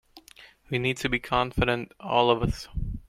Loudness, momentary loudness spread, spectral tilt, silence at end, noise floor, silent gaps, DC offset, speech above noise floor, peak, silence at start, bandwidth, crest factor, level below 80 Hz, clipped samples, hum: -26 LUFS; 9 LU; -5.5 dB/octave; 0.1 s; -53 dBFS; none; under 0.1%; 27 dB; -6 dBFS; 0.15 s; 16 kHz; 22 dB; -40 dBFS; under 0.1%; none